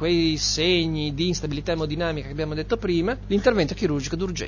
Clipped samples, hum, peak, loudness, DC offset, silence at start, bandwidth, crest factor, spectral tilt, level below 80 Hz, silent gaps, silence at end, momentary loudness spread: under 0.1%; 50 Hz at -35 dBFS; -8 dBFS; -24 LUFS; under 0.1%; 0 s; 7.2 kHz; 16 dB; -4.5 dB/octave; -38 dBFS; none; 0 s; 7 LU